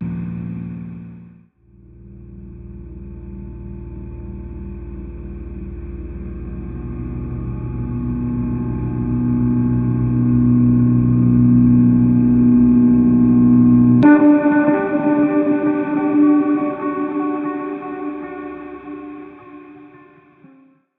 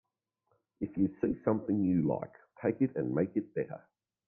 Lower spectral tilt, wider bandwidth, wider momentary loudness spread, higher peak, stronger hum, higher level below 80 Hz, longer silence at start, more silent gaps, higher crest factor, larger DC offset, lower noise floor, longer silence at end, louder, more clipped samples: about the same, -13 dB/octave vs -13.5 dB/octave; first, 3.7 kHz vs 2.8 kHz; first, 21 LU vs 11 LU; first, 0 dBFS vs -16 dBFS; neither; first, -34 dBFS vs -64 dBFS; second, 0 s vs 0.8 s; neither; about the same, 16 dB vs 18 dB; neither; second, -50 dBFS vs -80 dBFS; first, 1.1 s vs 0.5 s; first, -16 LUFS vs -33 LUFS; neither